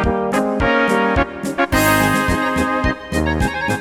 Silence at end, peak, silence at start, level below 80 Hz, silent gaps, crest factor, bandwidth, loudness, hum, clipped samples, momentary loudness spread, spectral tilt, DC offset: 0 s; -2 dBFS; 0 s; -30 dBFS; none; 16 dB; 19 kHz; -17 LUFS; none; under 0.1%; 6 LU; -5 dB/octave; under 0.1%